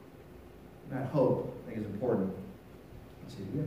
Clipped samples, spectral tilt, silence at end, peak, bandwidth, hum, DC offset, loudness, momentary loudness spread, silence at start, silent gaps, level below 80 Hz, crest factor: under 0.1%; -9 dB/octave; 0 s; -16 dBFS; 15.5 kHz; none; under 0.1%; -34 LUFS; 23 LU; 0 s; none; -60 dBFS; 20 dB